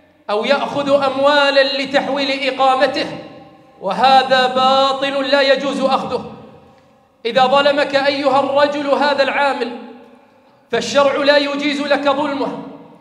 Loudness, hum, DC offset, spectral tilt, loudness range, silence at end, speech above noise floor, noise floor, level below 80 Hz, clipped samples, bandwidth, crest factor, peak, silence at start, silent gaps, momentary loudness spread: -15 LUFS; none; under 0.1%; -3.5 dB/octave; 2 LU; 0.15 s; 36 dB; -51 dBFS; -64 dBFS; under 0.1%; 10.5 kHz; 16 dB; 0 dBFS; 0.3 s; none; 12 LU